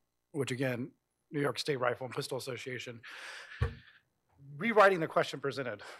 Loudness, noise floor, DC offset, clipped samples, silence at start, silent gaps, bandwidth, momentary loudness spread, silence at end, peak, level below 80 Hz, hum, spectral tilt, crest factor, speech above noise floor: -33 LUFS; -67 dBFS; under 0.1%; under 0.1%; 0.35 s; none; 15.5 kHz; 20 LU; 0 s; -12 dBFS; -56 dBFS; none; -5 dB/octave; 24 dB; 34 dB